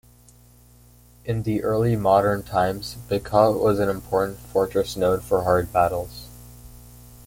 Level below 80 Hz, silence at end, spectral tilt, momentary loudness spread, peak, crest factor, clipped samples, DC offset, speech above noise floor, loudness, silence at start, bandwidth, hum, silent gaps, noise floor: -46 dBFS; 0.1 s; -6.5 dB/octave; 12 LU; -4 dBFS; 20 dB; under 0.1%; under 0.1%; 30 dB; -22 LUFS; 1.25 s; 17 kHz; 60 Hz at -40 dBFS; none; -52 dBFS